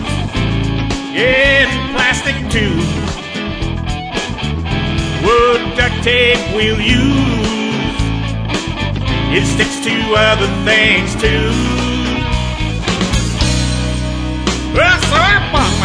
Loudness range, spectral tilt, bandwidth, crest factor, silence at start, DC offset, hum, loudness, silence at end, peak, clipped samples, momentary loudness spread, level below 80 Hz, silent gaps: 3 LU; -4.5 dB/octave; 11 kHz; 14 dB; 0 s; 0.1%; none; -14 LUFS; 0 s; 0 dBFS; under 0.1%; 9 LU; -24 dBFS; none